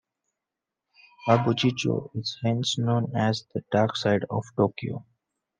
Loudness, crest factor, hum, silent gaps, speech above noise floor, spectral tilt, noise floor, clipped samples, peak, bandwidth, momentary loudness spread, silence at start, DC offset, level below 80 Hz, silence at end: -26 LUFS; 20 dB; none; none; 62 dB; -6 dB/octave; -87 dBFS; under 0.1%; -6 dBFS; 9.6 kHz; 9 LU; 1.2 s; under 0.1%; -68 dBFS; 0.55 s